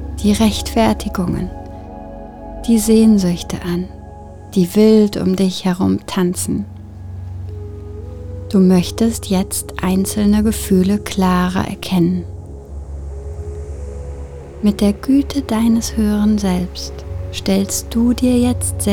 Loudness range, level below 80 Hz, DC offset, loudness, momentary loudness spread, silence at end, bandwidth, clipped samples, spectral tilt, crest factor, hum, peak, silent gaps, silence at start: 5 LU; -32 dBFS; under 0.1%; -16 LUFS; 18 LU; 0 s; 19 kHz; under 0.1%; -6 dB/octave; 16 dB; none; -2 dBFS; none; 0 s